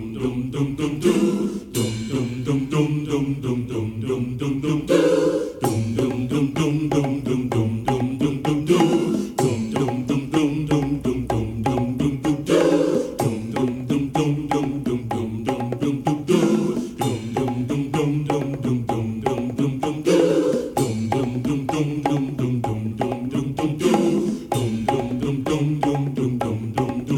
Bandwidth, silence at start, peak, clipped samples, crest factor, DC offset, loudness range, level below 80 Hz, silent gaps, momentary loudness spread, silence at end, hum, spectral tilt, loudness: 17 kHz; 0 s; -2 dBFS; under 0.1%; 18 dB; under 0.1%; 2 LU; -46 dBFS; none; 7 LU; 0 s; none; -6.5 dB/octave; -22 LUFS